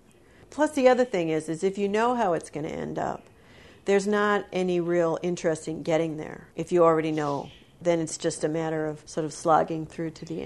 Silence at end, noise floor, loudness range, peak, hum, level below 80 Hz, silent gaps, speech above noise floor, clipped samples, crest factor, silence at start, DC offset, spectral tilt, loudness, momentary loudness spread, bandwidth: 0 s; -55 dBFS; 2 LU; -6 dBFS; none; -60 dBFS; none; 29 dB; under 0.1%; 20 dB; 0.5 s; under 0.1%; -5.5 dB/octave; -26 LUFS; 13 LU; 12 kHz